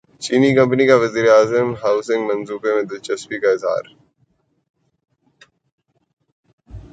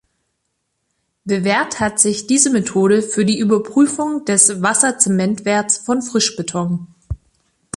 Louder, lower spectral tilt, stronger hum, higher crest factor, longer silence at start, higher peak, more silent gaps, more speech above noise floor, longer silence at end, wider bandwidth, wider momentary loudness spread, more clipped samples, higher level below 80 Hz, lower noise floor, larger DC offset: about the same, -17 LUFS vs -15 LUFS; first, -5.5 dB/octave vs -3.5 dB/octave; neither; about the same, 18 dB vs 18 dB; second, 0.2 s vs 1.25 s; about the same, 0 dBFS vs 0 dBFS; first, 4.70-4.74 s, 5.72-5.78 s, 6.13-6.17 s, 6.32-6.43 s, 6.53-6.58 s vs none; second, 47 dB vs 55 dB; second, 0.15 s vs 0.6 s; second, 9.2 kHz vs 12 kHz; about the same, 10 LU vs 11 LU; neither; second, -54 dBFS vs -46 dBFS; second, -64 dBFS vs -72 dBFS; neither